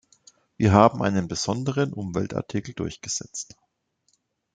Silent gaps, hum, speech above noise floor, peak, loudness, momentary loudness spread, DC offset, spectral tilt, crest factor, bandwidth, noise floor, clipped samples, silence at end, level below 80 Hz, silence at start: none; none; 48 dB; -2 dBFS; -24 LUFS; 15 LU; under 0.1%; -5.5 dB/octave; 24 dB; 9.4 kHz; -71 dBFS; under 0.1%; 1.1 s; -56 dBFS; 0.6 s